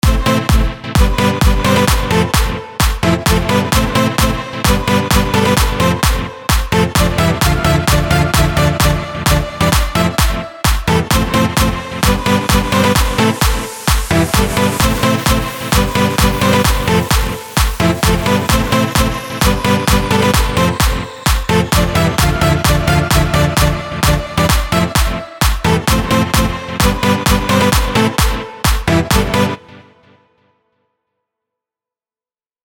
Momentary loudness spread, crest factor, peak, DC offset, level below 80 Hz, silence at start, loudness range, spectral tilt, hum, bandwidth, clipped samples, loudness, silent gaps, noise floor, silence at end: 4 LU; 14 dB; 0 dBFS; under 0.1%; -20 dBFS; 0.05 s; 1 LU; -4.5 dB/octave; none; 19.5 kHz; under 0.1%; -14 LUFS; none; under -90 dBFS; 2.85 s